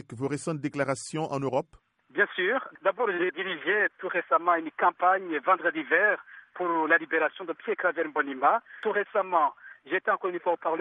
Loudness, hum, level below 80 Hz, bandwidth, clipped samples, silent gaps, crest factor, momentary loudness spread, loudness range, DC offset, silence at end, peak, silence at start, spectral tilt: -27 LUFS; none; -74 dBFS; 11 kHz; under 0.1%; none; 18 dB; 8 LU; 3 LU; under 0.1%; 0 s; -10 dBFS; 0.1 s; -5 dB/octave